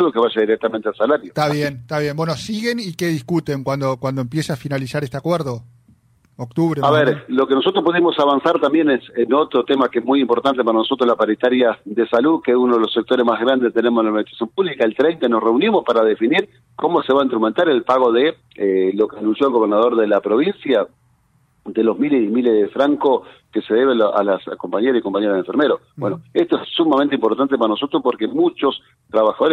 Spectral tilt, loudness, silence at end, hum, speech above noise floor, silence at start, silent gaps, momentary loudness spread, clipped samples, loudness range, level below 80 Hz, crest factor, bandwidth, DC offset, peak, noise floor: -6.5 dB/octave; -18 LUFS; 0 s; none; 42 dB; 0 s; none; 7 LU; under 0.1%; 5 LU; -60 dBFS; 14 dB; 14 kHz; under 0.1%; -4 dBFS; -59 dBFS